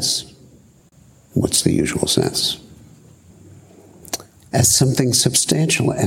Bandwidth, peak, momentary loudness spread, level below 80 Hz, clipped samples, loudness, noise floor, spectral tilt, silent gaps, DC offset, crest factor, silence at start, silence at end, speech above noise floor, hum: 17 kHz; 0 dBFS; 15 LU; -48 dBFS; under 0.1%; -17 LUFS; -50 dBFS; -3.5 dB/octave; none; under 0.1%; 20 dB; 0 s; 0 s; 33 dB; none